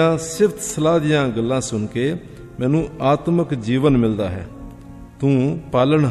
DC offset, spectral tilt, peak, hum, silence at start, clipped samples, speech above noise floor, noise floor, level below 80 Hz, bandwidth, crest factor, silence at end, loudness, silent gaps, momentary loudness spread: under 0.1%; -6.5 dB/octave; -2 dBFS; none; 0 s; under 0.1%; 20 dB; -38 dBFS; -42 dBFS; 14.5 kHz; 16 dB; 0 s; -19 LUFS; none; 14 LU